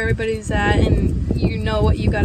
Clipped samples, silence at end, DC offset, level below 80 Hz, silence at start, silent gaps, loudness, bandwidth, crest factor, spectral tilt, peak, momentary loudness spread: under 0.1%; 0 s; under 0.1%; -24 dBFS; 0 s; none; -19 LUFS; 9.8 kHz; 16 dB; -7 dB/octave; -2 dBFS; 4 LU